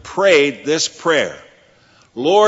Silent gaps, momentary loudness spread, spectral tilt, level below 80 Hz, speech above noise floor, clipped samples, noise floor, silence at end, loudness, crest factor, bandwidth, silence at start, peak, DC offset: none; 11 LU; -3 dB/octave; -60 dBFS; 37 dB; under 0.1%; -51 dBFS; 0 s; -16 LUFS; 16 dB; 8 kHz; 0.05 s; 0 dBFS; under 0.1%